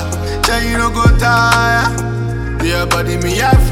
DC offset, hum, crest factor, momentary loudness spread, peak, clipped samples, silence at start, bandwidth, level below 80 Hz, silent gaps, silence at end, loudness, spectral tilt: under 0.1%; none; 12 dB; 8 LU; 0 dBFS; under 0.1%; 0 s; 16.5 kHz; -20 dBFS; none; 0 s; -13 LUFS; -5 dB/octave